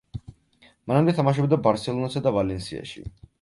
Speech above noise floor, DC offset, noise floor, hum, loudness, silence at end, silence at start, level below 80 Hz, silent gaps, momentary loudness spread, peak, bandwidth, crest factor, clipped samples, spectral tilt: 35 dB; under 0.1%; -58 dBFS; none; -23 LUFS; 0.3 s; 0.15 s; -50 dBFS; none; 19 LU; -6 dBFS; 11.5 kHz; 18 dB; under 0.1%; -7.5 dB/octave